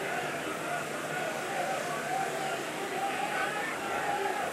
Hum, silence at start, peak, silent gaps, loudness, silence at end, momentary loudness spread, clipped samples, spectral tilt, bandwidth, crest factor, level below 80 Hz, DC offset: none; 0 s; -20 dBFS; none; -33 LUFS; 0 s; 3 LU; under 0.1%; -3 dB/octave; 16 kHz; 14 dB; -72 dBFS; under 0.1%